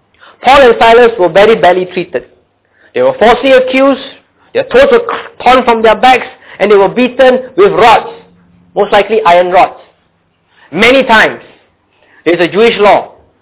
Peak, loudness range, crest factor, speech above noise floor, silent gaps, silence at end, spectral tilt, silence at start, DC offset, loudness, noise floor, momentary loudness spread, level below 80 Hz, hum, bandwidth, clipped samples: 0 dBFS; 3 LU; 8 dB; 48 dB; none; 0.35 s; -8 dB/octave; 0.45 s; 0.4%; -7 LUFS; -55 dBFS; 13 LU; -40 dBFS; none; 4 kHz; 2%